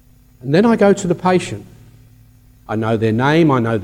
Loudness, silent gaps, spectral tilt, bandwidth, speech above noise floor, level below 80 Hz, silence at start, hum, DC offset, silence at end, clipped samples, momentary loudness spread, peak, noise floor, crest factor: -15 LUFS; none; -6.5 dB/octave; 13.5 kHz; 32 dB; -48 dBFS; 0.45 s; none; under 0.1%; 0 s; under 0.1%; 14 LU; -2 dBFS; -47 dBFS; 14 dB